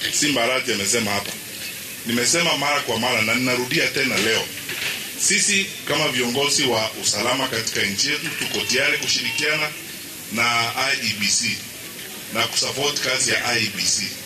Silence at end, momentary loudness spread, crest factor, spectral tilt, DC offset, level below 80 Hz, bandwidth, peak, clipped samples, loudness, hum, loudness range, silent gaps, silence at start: 0 s; 10 LU; 16 dB; -1.5 dB/octave; under 0.1%; -58 dBFS; 15 kHz; -6 dBFS; under 0.1%; -20 LUFS; none; 2 LU; none; 0 s